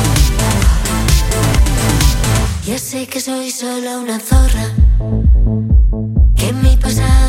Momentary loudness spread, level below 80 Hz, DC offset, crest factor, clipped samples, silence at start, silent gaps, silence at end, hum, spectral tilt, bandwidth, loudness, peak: 7 LU; -14 dBFS; under 0.1%; 12 dB; under 0.1%; 0 s; none; 0 s; none; -5 dB/octave; 16.5 kHz; -14 LUFS; 0 dBFS